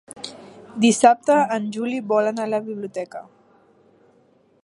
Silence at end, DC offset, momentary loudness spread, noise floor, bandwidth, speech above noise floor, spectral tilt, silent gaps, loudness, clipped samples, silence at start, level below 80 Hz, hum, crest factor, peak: 1.4 s; under 0.1%; 21 LU; -58 dBFS; 11.5 kHz; 38 dB; -4 dB/octave; none; -20 LUFS; under 0.1%; 0.1 s; -72 dBFS; none; 22 dB; -2 dBFS